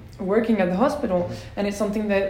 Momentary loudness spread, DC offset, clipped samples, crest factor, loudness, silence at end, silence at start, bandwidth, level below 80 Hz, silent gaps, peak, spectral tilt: 7 LU; under 0.1%; under 0.1%; 16 dB; -23 LUFS; 0 s; 0 s; 16 kHz; -46 dBFS; none; -6 dBFS; -6.5 dB/octave